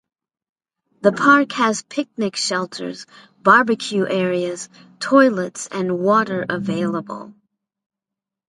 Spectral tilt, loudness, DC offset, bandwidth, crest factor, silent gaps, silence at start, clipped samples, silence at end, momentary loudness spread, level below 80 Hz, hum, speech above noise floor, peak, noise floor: -4.5 dB/octave; -18 LUFS; under 0.1%; 11.5 kHz; 20 dB; none; 1.05 s; under 0.1%; 1.2 s; 16 LU; -68 dBFS; none; 67 dB; 0 dBFS; -86 dBFS